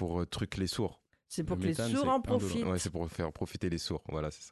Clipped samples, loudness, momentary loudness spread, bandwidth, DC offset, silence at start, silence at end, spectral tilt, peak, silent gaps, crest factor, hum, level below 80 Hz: under 0.1%; -34 LUFS; 8 LU; 12.5 kHz; under 0.1%; 0 s; 0 s; -5.5 dB/octave; -18 dBFS; none; 16 dB; none; -48 dBFS